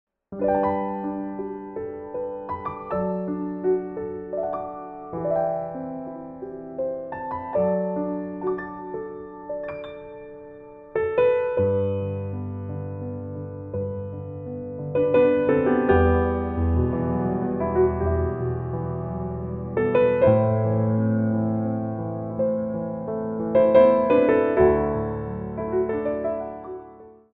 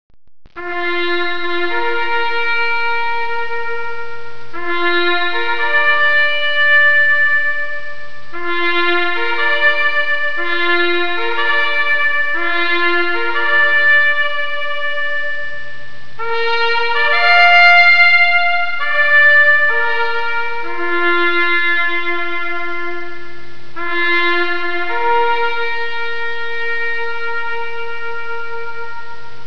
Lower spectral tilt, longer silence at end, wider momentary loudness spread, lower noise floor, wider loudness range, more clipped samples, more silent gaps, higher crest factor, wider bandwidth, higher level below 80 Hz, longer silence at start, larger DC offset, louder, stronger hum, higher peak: first, -11.5 dB/octave vs -4 dB/octave; first, 0.2 s vs 0.05 s; about the same, 15 LU vs 17 LU; first, -46 dBFS vs -37 dBFS; about the same, 8 LU vs 9 LU; neither; neither; about the same, 20 dB vs 16 dB; second, 4 kHz vs 5.4 kHz; first, -42 dBFS vs -54 dBFS; first, 0.3 s vs 0.1 s; second, under 0.1% vs 10%; second, -24 LUFS vs -14 LUFS; neither; second, -4 dBFS vs 0 dBFS